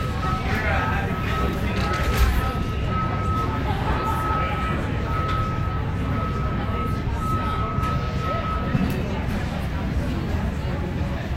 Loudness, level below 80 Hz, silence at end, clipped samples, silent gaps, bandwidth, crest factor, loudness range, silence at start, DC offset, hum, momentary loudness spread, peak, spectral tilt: -24 LUFS; -28 dBFS; 0 s; under 0.1%; none; 16 kHz; 14 dB; 2 LU; 0 s; under 0.1%; none; 4 LU; -8 dBFS; -6.5 dB/octave